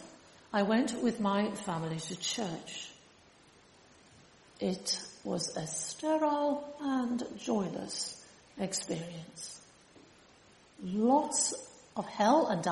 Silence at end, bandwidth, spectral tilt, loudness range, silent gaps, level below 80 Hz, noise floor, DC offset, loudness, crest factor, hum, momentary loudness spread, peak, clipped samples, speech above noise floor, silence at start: 0 s; 11.5 kHz; -4 dB/octave; 6 LU; none; -72 dBFS; -61 dBFS; under 0.1%; -33 LUFS; 20 dB; none; 16 LU; -14 dBFS; under 0.1%; 28 dB; 0 s